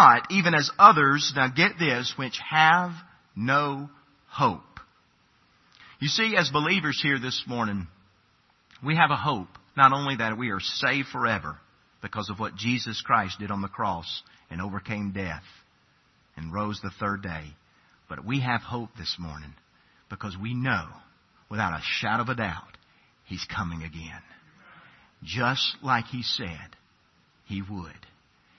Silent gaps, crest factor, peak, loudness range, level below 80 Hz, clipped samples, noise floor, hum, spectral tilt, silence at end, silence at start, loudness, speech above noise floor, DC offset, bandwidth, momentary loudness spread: none; 26 dB; 0 dBFS; 9 LU; -60 dBFS; under 0.1%; -64 dBFS; none; -4.5 dB/octave; 0.65 s; 0 s; -25 LUFS; 39 dB; under 0.1%; 6.4 kHz; 20 LU